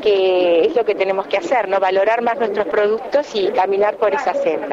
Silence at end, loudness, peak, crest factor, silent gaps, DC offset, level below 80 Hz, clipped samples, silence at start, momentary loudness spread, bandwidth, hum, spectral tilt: 0 s; -17 LUFS; -6 dBFS; 10 dB; none; under 0.1%; -58 dBFS; under 0.1%; 0 s; 4 LU; 7.6 kHz; none; -4.5 dB/octave